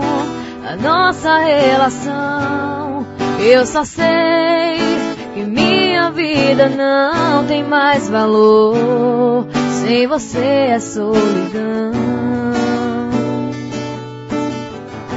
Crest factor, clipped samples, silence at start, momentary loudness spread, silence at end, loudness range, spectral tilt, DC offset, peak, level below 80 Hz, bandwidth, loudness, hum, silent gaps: 14 dB; under 0.1%; 0 s; 11 LU; 0 s; 5 LU; -5 dB/octave; under 0.1%; 0 dBFS; -48 dBFS; 8 kHz; -14 LUFS; none; none